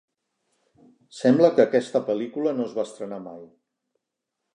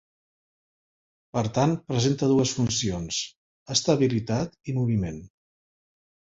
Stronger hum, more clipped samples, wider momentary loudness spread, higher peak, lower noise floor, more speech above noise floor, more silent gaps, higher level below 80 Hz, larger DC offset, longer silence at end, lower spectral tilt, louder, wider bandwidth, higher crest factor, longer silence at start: neither; neither; first, 17 LU vs 8 LU; first, -4 dBFS vs -8 dBFS; second, -83 dBFS vs under -90 dBFS; second, 60 dB vs over 65 dB; second, none vs 3.37-3.66 s; second, -80 dBFS vs -52 dBFS; neither; about the same, 1.1 s vs 1 s; first, -6.5 dB/octave vs -5 dB/octave; first, -22 LUFS vs -25 LUFS; first, 10 kHz vs 8 kHz; about the same, 22 dB vs 20 dB; second, 1.15 s vs 1.35 s